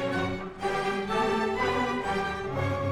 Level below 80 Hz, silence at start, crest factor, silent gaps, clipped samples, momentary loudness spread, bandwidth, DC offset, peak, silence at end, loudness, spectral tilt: -50 dBFS; 0 s; 14 dB; none; under 0.1%; 4 LU; 14.5 kHz; under 0.1%; -14 dBFS; 0 s; -29 LUFS; -5.5 dB/octave